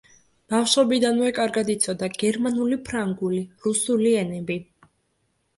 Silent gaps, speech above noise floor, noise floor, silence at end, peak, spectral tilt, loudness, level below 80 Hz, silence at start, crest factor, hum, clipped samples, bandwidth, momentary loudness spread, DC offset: none; 48 dB; -71 dBFS; 0.95 s; -6 dBFS; -4 dB/octave; -23 LUFS; -60 dBFS; 0.5 s; 18 dB; none; under 0.1%; 11.5 kHz; 8 LU; under 0.1%